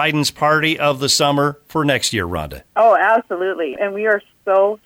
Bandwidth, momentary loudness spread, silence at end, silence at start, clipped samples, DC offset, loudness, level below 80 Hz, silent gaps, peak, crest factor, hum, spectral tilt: 17 kHz; 8 LU; 0.1 s; 0 s; under 0.1%; under 0.1%; -17 LUFS; -46 dBFS; none; -4 dBFS; 14 dB; none; -3.5 dB/octave